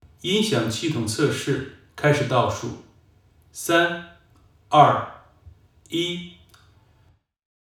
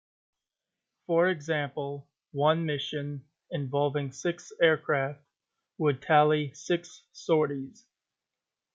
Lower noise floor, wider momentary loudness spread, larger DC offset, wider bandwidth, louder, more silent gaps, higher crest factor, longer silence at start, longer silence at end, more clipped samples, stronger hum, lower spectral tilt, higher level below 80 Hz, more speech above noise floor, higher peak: second, -60 dBFS vs -89 dBFS; first, 18 LU vs 15 LU; neither; first, 17.5 kHz vs 7.8 kHz; first, -22 LUFS vs -29 LUFS; neither; about the same, 24 dB vs 20 dB; second, 0.25 s vs 1.1 s; first, 1.45 s vs 1.05 s; neither; neither; about the same, -4.5 dB/octave vs -5.5 dB/octave; first, -60 dBFS vs -76 dBFS; second, 39 dB vs 61 dB; first, 0 dBFS vs -10 dBFS